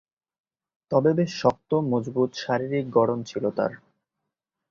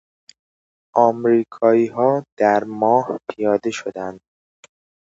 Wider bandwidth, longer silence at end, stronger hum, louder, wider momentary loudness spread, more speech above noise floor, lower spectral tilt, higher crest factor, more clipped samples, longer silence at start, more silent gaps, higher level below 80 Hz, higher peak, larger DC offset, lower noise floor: about the same, 7.4 kHz vs 7.8 kHz; about the same, 0.95 s vs 0.95 s; neither; second, -25 LUFS vs -19 LUFS; second, 6 LU vs 11 LU; second, 60 dB vs over 72 dB; about the same, -7 dB/octave vs -6.5 dB/octave; about the same, 20 dB vs 20 dB; neither; about the same, 0.9 s vs 0.95 s; second, none vs 2.32-2.37 s; about the same, -64 dBFS vs -66 dBFS; second, -6 dBFS vs 0 dBFS; neither; second, -84 dBFS vs under -90 dBFS